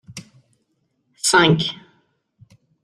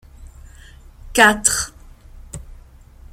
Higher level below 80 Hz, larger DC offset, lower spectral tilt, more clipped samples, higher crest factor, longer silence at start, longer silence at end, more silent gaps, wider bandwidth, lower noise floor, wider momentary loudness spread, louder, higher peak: second, -58 dBFS vs -40 dBFS; neither; first, -3.5 dB/octave vs -1.5 dB/octave; neither; about the same, 22 dB vs 22 dB; about the same, 0.1 s vs 0.2 s; first, 1.1 s vs 0.6 s; neither; second, 13 kHz vs 16.5 kHz; first, -69 dBFS vs -43 dBFS; about the same, 25 LU vs 25 LU; about the same, -17 LUFS vs -15 LUFS; about the same, -2 dBFS vs 0 dBFS